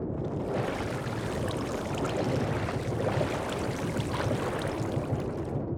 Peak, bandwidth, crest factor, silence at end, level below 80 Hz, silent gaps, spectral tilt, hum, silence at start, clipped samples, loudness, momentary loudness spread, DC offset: -16 dBFS; 18 kHz; 14 dB; 0 s; -48 dBFS; none; -6.5 dB/octave; none; 0 s; under 0.1%; -31 LUFS; 4 LU; under 0.1%